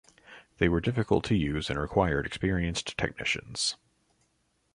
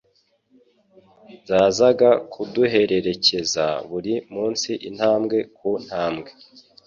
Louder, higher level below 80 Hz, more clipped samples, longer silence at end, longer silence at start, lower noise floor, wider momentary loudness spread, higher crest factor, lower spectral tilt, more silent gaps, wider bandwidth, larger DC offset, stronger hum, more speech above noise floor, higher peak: second, -29 LUFS vs -21 LUFS; first, -44 dBFS vs -60 dBFS; neither; first, 1 s vs 0.55 s; second, 0.3 s vs 1.3 s; first, -73 dBFS vs -64 dBFS; second, 5 LU vs 11 LU; about the same, 20 dB vs 18 dB; about the same, -5 dB/octave vs -4 dB/octave; neither; first, 11.5 kHz vs 7.6 kHz; neither; neither; about the same, 44 dB vs 44 dB; second, -10 dBFS vs -4 dBFS